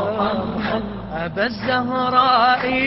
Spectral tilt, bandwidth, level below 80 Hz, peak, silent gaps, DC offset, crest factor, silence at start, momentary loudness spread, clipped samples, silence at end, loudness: -9.5 dB/octave; 5.8 kHz; -44 dBFS; -2 dBFS; none; under 0.1%; 16 dB; 0 s; 11 LU; under 0.1%; 0 s; -19 LUFS